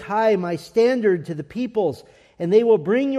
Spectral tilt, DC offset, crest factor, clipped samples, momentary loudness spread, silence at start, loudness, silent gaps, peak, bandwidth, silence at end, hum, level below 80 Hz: -7 dB/octave; under 0.1%; 14 dB; under 0.1%; 12 LU; 0 s; -20 LUFS; none; -6 dBFS; 11.5 kHz; 0 s; none; -62 dBFS